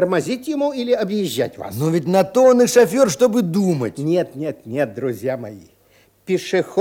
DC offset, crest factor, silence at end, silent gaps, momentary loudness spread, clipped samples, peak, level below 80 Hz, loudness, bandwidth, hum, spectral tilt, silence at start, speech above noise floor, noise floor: under 0.1%; 18 dB; 0 s; none; 12 LU; under 0.1%; 0 dBFS; -62 dBFS; -18 LUFS; 17 kHz; none; -5.5 dB/octave; 0 s; 37 dB; -55 dBFS